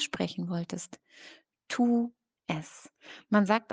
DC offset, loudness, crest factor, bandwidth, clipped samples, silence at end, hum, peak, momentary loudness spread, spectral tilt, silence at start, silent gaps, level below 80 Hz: under 0.1%; -31 LUFS; 22 dB; 9.6 kHz; under 0.1%; 0 s; none; -10 dBFS; 24 LU; -5 dB/octave; 0 s; none; -74 dBFS